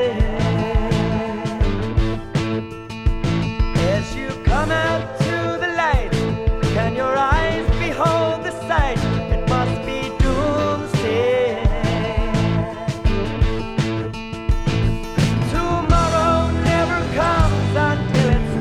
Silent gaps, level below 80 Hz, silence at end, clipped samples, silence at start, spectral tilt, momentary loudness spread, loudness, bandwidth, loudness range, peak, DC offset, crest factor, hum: none; -24 dBFS; 0 s; under 0.1%; 0 s; -6.5 dB/octave; 6 LU; -20 LUFS; 13 kHz; 3 LU; -2 dBFS; under 0.1%; 16 dB; none